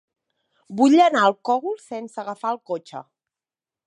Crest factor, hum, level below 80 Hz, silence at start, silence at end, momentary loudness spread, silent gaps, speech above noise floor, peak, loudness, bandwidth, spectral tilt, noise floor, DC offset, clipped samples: 18 dB; none; -80 dBFS; 0.7 s; 0.85 s; 19 LU; none; over 69 dB; -4 dBFS; -20 LUFS; 10.5 kHz; -4.5 dB/octave; under -90 dBFS; under 0.1%; under 0.1%